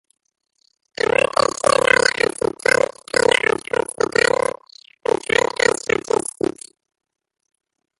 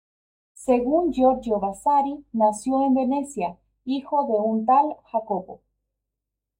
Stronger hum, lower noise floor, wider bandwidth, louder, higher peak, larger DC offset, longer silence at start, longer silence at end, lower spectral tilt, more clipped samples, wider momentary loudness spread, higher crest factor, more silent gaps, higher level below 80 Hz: neither; second, -47 dBFS vs -84 dBFS; second, 12 kHz vs 14 kHz; first, -18 LUFS vs -23 LUFS; first, 0 dBFS vs -8 dBFS; neither; first, 1.65 s vs 0.6 s; first, 2.25 s vs 1.05 s; second, -2 dB/octave vs -6 dB/octave; neither; about the same, 10 LU vs 11 LU; about the same, 20 dB vs 16 dB; neither; about the same, -54 dBFS vs -56 dBFS